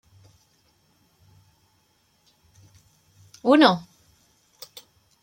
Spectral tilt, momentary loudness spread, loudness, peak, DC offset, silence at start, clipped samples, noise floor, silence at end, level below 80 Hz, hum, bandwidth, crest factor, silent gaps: -5.5 dB/octave; 28 LU; -19 LUFS; -2 dBFS; under 0.1%; 3.45 s; under 0.1%; -66 dBFS; 1.4 s; -70 dBFS; none; 16.5 kHz; 26 dB; none